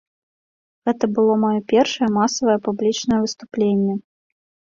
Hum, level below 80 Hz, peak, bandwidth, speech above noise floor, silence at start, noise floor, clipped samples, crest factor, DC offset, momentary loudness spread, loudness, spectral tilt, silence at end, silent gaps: none; -58 dBFS; -4 dBFS; 7.6 kHz; over 71 dB; 0.85 s; under -90 dBFS; under 0.1%; 16 dB; under 0.1%; 7 LU; -19 LUFS; -5 dB/octave; 0.75 s; none